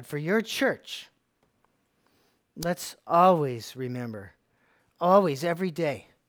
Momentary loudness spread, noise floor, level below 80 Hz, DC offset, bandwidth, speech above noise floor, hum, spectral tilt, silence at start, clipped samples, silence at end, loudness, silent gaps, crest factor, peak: 15 LU; -71 dBFS; -66 dBFS; under 0.1%; over 20 kHz; 45 dB; none; -5.5 dB/octave; 0 s; under 0.1%; 0.3 s; -26 LUFS; none; 22 dB; -6 dBFS